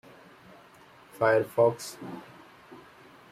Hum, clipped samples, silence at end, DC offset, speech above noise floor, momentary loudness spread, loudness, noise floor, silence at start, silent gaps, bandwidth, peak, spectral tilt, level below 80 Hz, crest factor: none; under 0.1%; 0.55 s; under 0.1%; 28 dB; 26 LU; -26 LUFS; -55 dBFS; 1.2 s; none; 15.5 kHz; -10 dBFS; -5.5 dB/octave; -74 dBFS; 22 dB